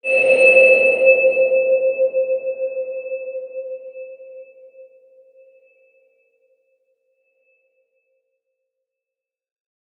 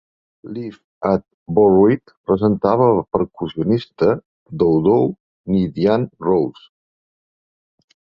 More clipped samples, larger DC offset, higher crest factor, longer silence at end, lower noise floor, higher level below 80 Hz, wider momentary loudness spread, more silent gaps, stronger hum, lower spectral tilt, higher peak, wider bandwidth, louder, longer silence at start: neither; neither; about the same, 20 dB vs 16 dB; first, 5.15 s vs 1.6 s; about the same, -87 dBFS vs under -90 dBFS; second, -80 dBFS vs -48 dBFS; first, 22 LU vs 15 LU; second, none vs 0.84-1.01 s, 1.34-1.46 s, 2.17-2.24 s, 4.25-4.46 s, 5.20-5.44 s; neither; second, -3 dB/octave vs -10 dB/octave; about the same, -2 dBFS vs -2 dBFS; first, 9.4 kHz vs 5.8 kHz; first, -15 LUFS vs -18 LUFS; second, 0.05 s vs 0.45 s